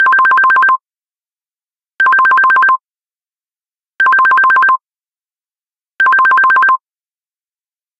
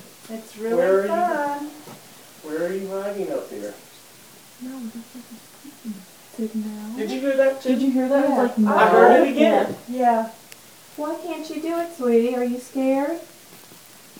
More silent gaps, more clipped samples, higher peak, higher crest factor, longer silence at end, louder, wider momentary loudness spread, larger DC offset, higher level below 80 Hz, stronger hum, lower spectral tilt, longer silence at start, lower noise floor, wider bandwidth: neither; neither; about the same, 0 dBFS vs 0 dBFS; second, 12 dB vs 22 dB; first, 1.25 s vs 0.45 s; first, -9 LUFS vs -21 LUFS; second, 6 LU vs 22 LU; second, under 0.1% vs 0.1%; about the same, -74 dBFS vs -76 dBFS; neither; second, -1.5 dB/octave vs -5.5 dB/octave; about the same, 0 s vs 0.05 s; first, under -90 dBFS vs -47 dBFS; second, 7.6 kHz vs 20 kHz